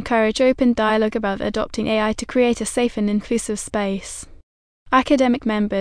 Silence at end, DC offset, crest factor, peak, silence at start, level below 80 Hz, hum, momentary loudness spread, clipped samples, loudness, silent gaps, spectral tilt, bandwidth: 0 s; under 0.1%; 16 dB; -4 dBFS; 0 s; -42 dBFS; none; 7 LU; under 0.1%; -20 LUFS; 4.43-4.86 s; -4.5 dB/octave; 10.5 kHz